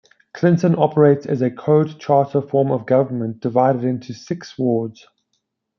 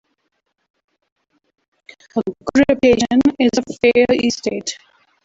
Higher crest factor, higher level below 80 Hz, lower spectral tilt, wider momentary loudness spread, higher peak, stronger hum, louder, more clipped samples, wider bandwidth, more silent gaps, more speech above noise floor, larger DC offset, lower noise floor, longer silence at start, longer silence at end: about the same, 16 dB vs 18 dB; second, -66 dBFS vs -48 dBFS; first, -8.5 dB/octave vs -4.5 dB/octave; about the same, 10 LU vs 12 LU; about the same, -2 dBFS vs 0 dBFS; neither; about the same, -18 LUFS vs -16 LUFS; neither; second, 7 kHz vs 7.8 kHz; neither; about the same, 55 dB vs 55 dB; neither; about the same, -73 dBFS vs -70 dBFS; second, 0.35 s vs 2.15 s; first, 0.85 s vs 0.5 s